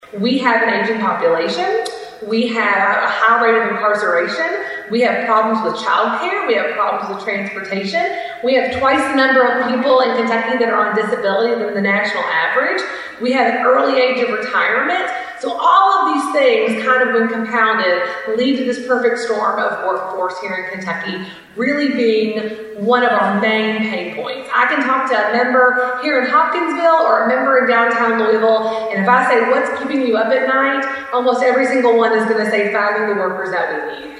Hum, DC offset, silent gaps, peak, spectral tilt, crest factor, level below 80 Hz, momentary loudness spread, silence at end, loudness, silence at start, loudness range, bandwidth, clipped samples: none; under 0.1%; none; 0 dBFS; -5 dB/octave; 14 dB; -60 dBFS; 8 LU; 0 s; -15 LUFS; 0.1 s; 4 LU; 11.5 kHz; under 0.1%